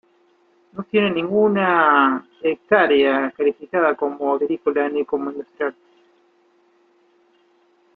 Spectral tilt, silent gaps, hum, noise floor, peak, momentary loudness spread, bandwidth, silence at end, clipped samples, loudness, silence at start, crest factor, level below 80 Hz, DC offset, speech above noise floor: -8.5 dB/octave; none; none; -59 dBFS; -2 dBFS; 12 LU; 4.4 kHz; 2.25 s; under 0.1%; -19 LUFS; 0.75 s; 20 dB; -66 dBFS; under 0.1%; 40 dB